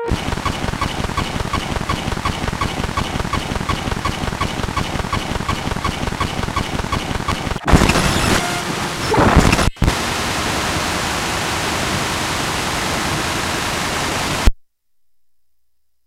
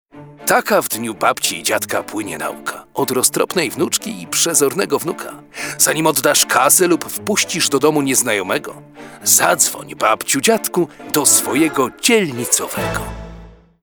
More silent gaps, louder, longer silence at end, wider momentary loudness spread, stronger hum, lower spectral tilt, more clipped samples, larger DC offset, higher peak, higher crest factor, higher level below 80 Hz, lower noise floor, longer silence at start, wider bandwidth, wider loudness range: neither; second, -19 LUFS vs -15 LUFS; first, 1.45 s vs 0.3 s; second, 7 LU vs 12 LU; neither; first, -4 dB/octave vs -2 dB/octave; neither; neither; about the same, 0 dBFS vs 0 dBFS; about the same, 20 dB vs 18 dB; first, -26 dBFS vs -46 dBFS; first, -70 dBFS vs -39 dBFS; second, 0 s vs 0.15 s; second, 16 kHz vs over 20 kHz; about the same, 5 LU vs 4 LU